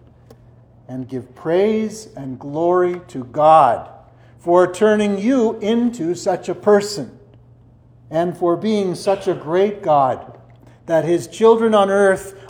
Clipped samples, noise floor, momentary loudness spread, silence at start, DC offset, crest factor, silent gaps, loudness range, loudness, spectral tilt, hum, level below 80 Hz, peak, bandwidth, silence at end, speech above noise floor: under 0.1%; -48 dBFS; 15 LU; 0.9 s; under 0.1%; 18 dB; none; 4 LU; -17 LUFS; -6 dB/octave; none; -56 dBFS; 0 dBFS; 16 kHz; 0.05 s; 31 dB